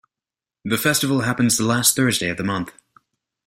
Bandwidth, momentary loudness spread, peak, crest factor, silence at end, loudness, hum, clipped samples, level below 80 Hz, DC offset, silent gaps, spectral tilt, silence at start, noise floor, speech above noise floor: 16.5 kHz; 11 LU; -2 dBFS; 20 dB; 0.75 s; -19 LUFS; none; under 0.1%; -56 dBFS; under 0.1%; none; -3.5 dB/octave; 0.65 s; -89 dBFS; 70 dB